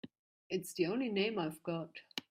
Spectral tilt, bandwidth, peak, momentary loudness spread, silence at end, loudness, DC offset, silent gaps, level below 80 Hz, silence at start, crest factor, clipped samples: -5 dB/octave; 16 kHz; -20 dBFS; 10 LU; 0.1 s; -38 LUFS; under 0.1%; 0.19-0.50 s; -80 dBFS; 0.05 s; 18 dB; under 0.1%